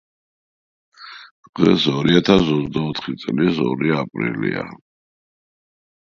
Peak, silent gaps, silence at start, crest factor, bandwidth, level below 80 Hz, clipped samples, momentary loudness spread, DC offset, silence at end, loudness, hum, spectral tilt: 0 dBFS; 1.31-1.43 s, 1.49-1.53 s; 1 s; 20 dB; 7.6 kHz; -48 dBFS; under 0.1%; 19 LU; under 0.1%; 1.35 s; -19 LUFS; none; -6.5 dB/octave